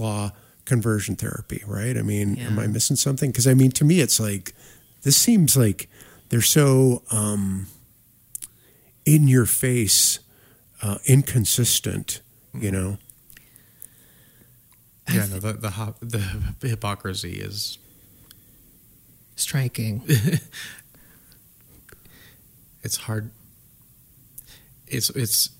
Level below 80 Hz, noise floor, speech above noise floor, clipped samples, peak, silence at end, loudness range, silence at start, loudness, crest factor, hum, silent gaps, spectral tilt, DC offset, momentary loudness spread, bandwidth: -50 dBFS; -56 dBFS; 35 dB; under 0.1%; -4 dBFS; 0.1 s; 12 LU; 0 s; -21 LUFS; 20 dB; none; none; -4.5 dB/octave; under 0.1%; 20 LU; 16.5 kHz